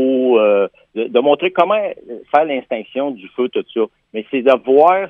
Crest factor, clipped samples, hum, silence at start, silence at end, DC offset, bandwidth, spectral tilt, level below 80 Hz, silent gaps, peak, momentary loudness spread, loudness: 16 dB; under 0.1%; none; 0 s; 0 s; under 0.1%; 4.7 kHz; -7 dB/octave; -68 dBFS; none; 0 dBFS; 11 LU; -16 LUFS